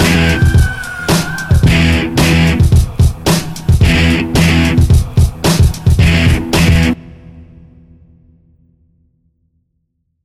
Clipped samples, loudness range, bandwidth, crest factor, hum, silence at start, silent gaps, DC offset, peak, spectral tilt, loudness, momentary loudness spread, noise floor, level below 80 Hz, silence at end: under 0.1%; 6 LU; 15 kHz; 12 dB; none; 0 s; none; under 0.1%; 0 dBFS; -5.5 dB/octave; -11 LUFS; 5 LU; -65 dBFS; -18 dBFS; 2.8 s